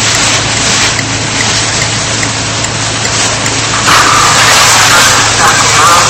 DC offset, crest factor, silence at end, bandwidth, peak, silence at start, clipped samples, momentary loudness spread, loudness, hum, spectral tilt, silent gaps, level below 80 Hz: under 0.1%; 8 dB; 0 s; over 20 kHz; 0 dBFS; 0 s; 0.7%; 8 LU; -6 LUFS; none; -1.5 dB/octave; none; -32 dBFS